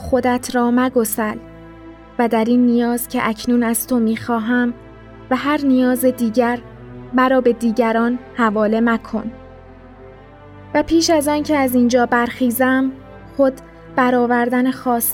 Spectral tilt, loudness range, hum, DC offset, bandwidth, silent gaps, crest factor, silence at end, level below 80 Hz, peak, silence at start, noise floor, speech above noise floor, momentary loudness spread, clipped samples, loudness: -4.5 dB/octave; 2 LU; none; under 0.1%; 18 kHz; none; 14 dB; 0 s; -46 dBFS; -2 dBFS; 0 s; -40 dBFS; 24 dB; 10 LU; under 0.1%; -17 LUFS